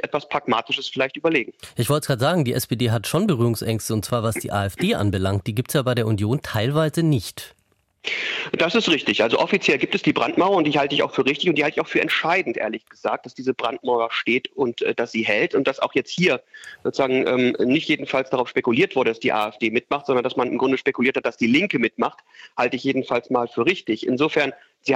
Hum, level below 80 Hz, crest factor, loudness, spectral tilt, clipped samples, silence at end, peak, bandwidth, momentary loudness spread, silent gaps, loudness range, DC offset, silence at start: none; -58 dBFS; 16 dB; -21 LUFS; -5.5 dB/octave; under 0.1%; 0 s; -4 dBFS; 16 kHz; 6 LU; none; 3 LU; under 0.1%; 0.05 s